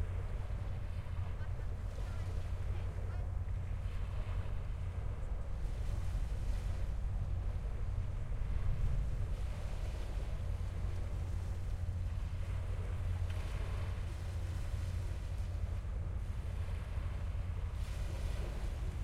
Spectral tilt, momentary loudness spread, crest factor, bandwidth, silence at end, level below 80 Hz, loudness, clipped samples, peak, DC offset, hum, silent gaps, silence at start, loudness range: -7 dB/octave; 3 LU; 14 dB; 12.5 kHz; 0 s; -40 dBFS; -41 LUFS; under 0.1%; -24 dBFS; under 0.1%; none; none; 0 s; 1 LU